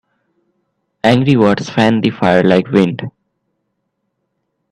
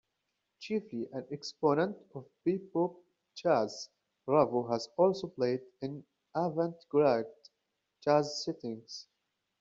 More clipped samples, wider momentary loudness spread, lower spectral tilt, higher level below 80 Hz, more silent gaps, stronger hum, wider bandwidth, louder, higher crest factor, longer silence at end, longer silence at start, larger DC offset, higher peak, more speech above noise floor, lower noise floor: neither; second, 7 LU vs 18 LU; first, -7 dB/octave vs -5.5 dB/octave; first, -52 dBFS vs -76 dBFS; neither; neither; first, 10.5 kHz vs 7.8 kHz; first, -13 LUFS vs -33 LUFS; second, 16 dB vs 22 dB; first, 1.6 s vs 0.6 s; first, 1.05 s vs 0.6 s; neither; first, 0 dBFS vs -12 dBFS; first, 58 dB vs 52 dB; second, -70 dBFS vs -84 dBFS